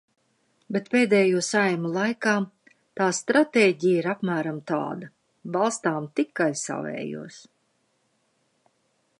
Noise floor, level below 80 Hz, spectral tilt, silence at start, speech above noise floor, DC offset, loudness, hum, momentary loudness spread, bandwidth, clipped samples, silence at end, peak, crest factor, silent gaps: -70 dBFS; -78 dBFS; -4.5 dB/octave; 0.7 s; 46 dB; under 0.1%; -24 LUFS; none; 15 LU; 11.5 kHz; under 0.1%; 1.8 s; -6 dBFS; 18 dB; none